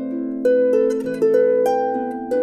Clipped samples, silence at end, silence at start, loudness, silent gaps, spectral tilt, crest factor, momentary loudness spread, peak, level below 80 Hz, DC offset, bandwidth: under 0.1%; 0 s; 0 s; -19 LUFS; none; -6.5 dB/octave; 12 dB; 7 LU; -6 dBFS; -64 dBFS; under 0.1%; 14 kHz